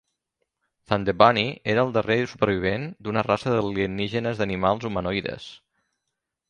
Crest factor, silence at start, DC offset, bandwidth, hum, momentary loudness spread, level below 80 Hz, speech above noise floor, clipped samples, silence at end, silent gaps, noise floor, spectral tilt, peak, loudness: 24 dB; 0.9 s; under 0.1%; 10 kHz; none; 10 LU; -50 dBFS; 58 dB; under 0.1%; 0.95 s; none; -82 dBFS; -6.5 dB/octave; 0 dBFS; -24 LUFS